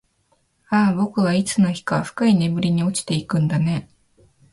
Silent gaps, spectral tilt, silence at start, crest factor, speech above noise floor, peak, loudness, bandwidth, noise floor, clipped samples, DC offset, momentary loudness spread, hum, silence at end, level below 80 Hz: none; -6 dB/octave; 0.7 s; 16 dB; 46 dB; -4 dBFS; -20 LUFS; 11.5 kHz; -65 dBFS; under 0.1%; under 0.1%; 6 LU; none; 0.7 s; -54 dBFS